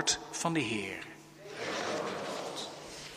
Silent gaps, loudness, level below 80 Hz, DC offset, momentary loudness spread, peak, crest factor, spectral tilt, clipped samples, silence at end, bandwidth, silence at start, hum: none; -36 LUFS; -68 dBFS; under 0.1%; 13 LU; -14 dBFS; 22 dB; -2.5 dB/octave; under 0.1%; 0 s; 15.5 kHz; 0 s; none